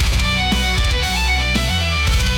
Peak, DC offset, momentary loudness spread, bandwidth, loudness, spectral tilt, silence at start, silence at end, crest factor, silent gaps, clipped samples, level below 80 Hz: -6 dBFS; under 0.1%; 1 LU; 18.5 kHz; -17 LUFS; -3.5 dB/octave; 0 s; 0 s; 10 dB; none; under 0.1%; -20 dBFS